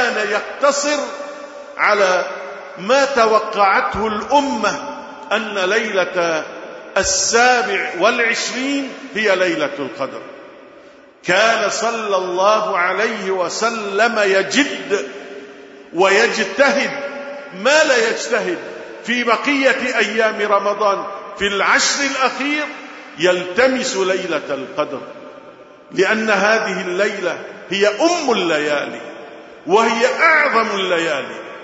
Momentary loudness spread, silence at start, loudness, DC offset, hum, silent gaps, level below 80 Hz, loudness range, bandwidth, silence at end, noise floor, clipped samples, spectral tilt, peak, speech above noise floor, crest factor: 16 LU; 0 s; -16 LUFS; under 0.1%; none; none; -54 dBFS; 3 LU; 8 kHz; 0 s; -43 dBFS; under 0.1%; -2.5 dB/octave; 0 dBFS; 26 dB; 18 dB